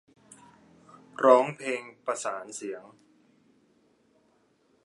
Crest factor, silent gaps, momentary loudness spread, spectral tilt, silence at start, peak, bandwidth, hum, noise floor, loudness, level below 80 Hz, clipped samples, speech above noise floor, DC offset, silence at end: 26 dB; none; 19 LU; -4 dB/octave; 1.2 s; -4 dBFS; 11.5 kHz; none; -67 dBFS; -27 LUFS; -84 dBFS; under 0.1%; 41 dB; under 0.1%; 2.05 s